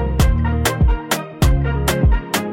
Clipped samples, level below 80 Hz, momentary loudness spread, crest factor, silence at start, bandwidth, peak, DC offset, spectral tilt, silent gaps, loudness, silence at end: under 0.1%; -18 dBFS; 3 LU; 12 dB; 0 s; 17 kHz; -4 dBFS; under 0.1%; -5.5 dB/octave; none; -18 LUFS; 0 s